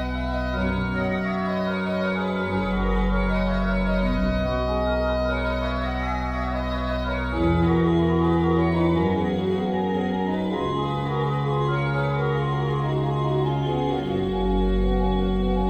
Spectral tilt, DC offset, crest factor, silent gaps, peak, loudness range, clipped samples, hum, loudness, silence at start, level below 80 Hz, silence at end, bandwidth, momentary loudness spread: -8.5 dB/octave; under 0.1%; 12 dB; none; -10 dBFS; 3 LU; under 0.1%; none; -24 LUFS; 0 s; -30 dBFS; 0 s; 8.6 kHz; 5 LU